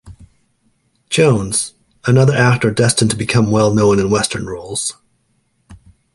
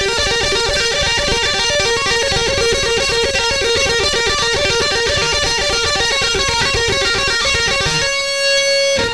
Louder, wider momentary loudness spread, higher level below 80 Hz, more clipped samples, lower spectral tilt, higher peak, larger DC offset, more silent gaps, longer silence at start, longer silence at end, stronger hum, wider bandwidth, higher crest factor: about the same, -15 LUFS vs -14 LUFS; first, 11 LU vs 1 LU; second, -44 dBFS vs -32 dBFS; neither; first, -5 dB/octave vs -1.5 dB/octave; first, 0 dBFS vs -4 dBFS; second, under 0.1% vs 0.9%; neither; about the same, 0.05 s vs 0 s; first, 0.4 s vs 0 s; neither; about the same, 11.5 kHz vs 11 kHz; about the same, 16 dB vs 12 dB